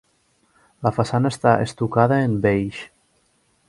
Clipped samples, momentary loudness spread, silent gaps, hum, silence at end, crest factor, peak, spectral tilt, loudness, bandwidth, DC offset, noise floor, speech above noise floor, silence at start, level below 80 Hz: under 0.1%; 11 LU; none; none; 0.8 s; 20 dB; 0 dBFS; -7 dB/octave; -20 LUFS; 11.5 kHz; under 0.1%; -64 dBFS; 44 dB; 0.8 s; -50 dBFS